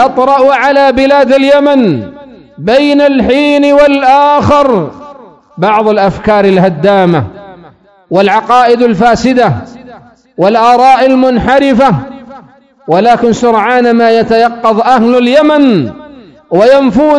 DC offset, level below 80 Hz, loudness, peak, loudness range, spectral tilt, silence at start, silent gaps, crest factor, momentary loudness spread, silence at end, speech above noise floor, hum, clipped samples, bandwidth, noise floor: under 0.1%; -36 dBFS; -7 LUFS; 0 dBFS; 2 LU; -6.5 dB/octave; 0 s; none; 8 dB; 8 LU; 0 s; 32 dB; none; 5%; 11 kHz; -39 dBFS